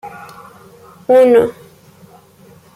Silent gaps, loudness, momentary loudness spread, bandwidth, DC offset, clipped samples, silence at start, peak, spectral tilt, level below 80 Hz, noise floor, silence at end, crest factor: none; -11 LUFS; 26 LU; 14.5 kHz; under 0.1%; under 0.1%; 0.05 s; -2 dBFS; -6 dB/octave; -58 dBFS; -45 dBFS; 1.25 s; 14 dB